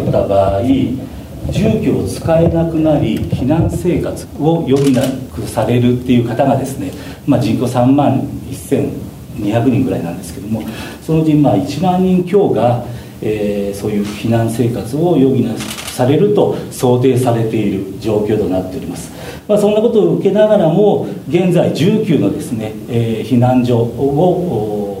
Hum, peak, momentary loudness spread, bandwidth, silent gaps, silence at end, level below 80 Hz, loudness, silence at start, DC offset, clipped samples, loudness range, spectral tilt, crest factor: none; 0 dBFS; 11 LU; 16 kHz; none; 0 s; -36 dBFS; -14 LUFS; 0 s; under 0.1%; under 0.1%; 3 LU; -7.5 dB/octave; 14 dB